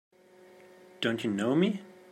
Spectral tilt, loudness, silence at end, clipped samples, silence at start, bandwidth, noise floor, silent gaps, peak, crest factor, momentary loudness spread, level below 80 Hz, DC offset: -6 dB/octave; -30 LUFS; 0.2 s; under 0.1%; 1 s; 14 kHz; -57 dBFS; none; -14 dBFS; 18 dB; 7 LU; -80 dBFS; under 0.1%